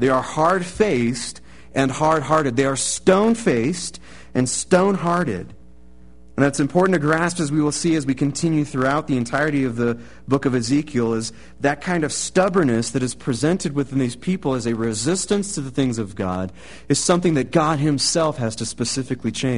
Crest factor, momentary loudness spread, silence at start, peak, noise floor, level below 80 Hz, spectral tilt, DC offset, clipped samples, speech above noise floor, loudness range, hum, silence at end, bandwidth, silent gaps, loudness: 20 dB; 8 LU; 0 s; 0 dBFS; -48 dBFS; -48 dBFS; -5 dB/octave; 0.7%; under 0.1%; 28 dB; 3 LU; none; 0 s; 11 kHz; none; -20 LUFS